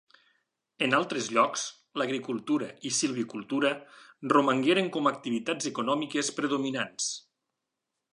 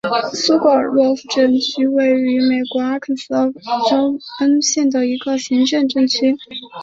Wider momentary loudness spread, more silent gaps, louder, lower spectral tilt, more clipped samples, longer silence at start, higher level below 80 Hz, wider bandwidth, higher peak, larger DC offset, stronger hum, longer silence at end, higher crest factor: about the same, 8 LU vs 6 LU; neither; second, -28 LUFS vs -16 LUFS; about the same, -3 dB/octave vs -3 dB/octave; neither; first, 0.8 s vs 0.05 s; second, -82 dBFS vs -62 dBFS; first, 11.5 kHz vs 7.8 kHz; second, -8 dBFS vs -2 dBFS; neither; neither; first, 0.95 s vs 0 s; first, 22 dB vs 14 dB